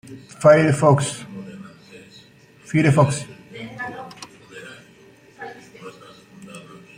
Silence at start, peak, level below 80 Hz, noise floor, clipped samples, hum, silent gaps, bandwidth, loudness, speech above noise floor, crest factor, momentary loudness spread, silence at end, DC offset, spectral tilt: 0.1 s; -2 dBFS; -58 dBFS; -50 dBFS; under 0.1%; none; none; 11 kHz; -18 LUFS; 33 dB; 20 dB; 26 LU; 0.4 s; under 0.1%; -6.5 dB/octave